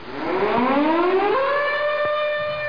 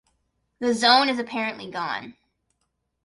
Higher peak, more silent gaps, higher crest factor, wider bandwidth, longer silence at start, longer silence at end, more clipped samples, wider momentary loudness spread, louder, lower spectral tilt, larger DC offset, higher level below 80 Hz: second, -8 dBFS vs -4 dBFS; neither; second, 12 dB vs 22 dB; second, 5.2 kHz vs 11.5 kHz; second, 0 s vs 0.6 s; second, 0 s vs 0.95 s; neither; second, 4 LU vs 13 LU; about the same, -20 LUFS vs -22 LUFS; first, -6.5 dB/octave vs -2.5 dB/octave; first, 1% vs under 0.1%; first, -56 dBFS vs -68 dBFS